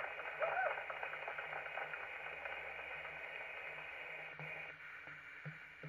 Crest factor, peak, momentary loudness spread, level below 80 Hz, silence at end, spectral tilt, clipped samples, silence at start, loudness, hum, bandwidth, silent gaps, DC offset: 20 dB; -26 dBFS; 11 LU; -78 dBFS; 0 s; -5 dB/octave; under 0.1%; 0 s; -45 LUFS; none; 14 kHz; none; under 0.1%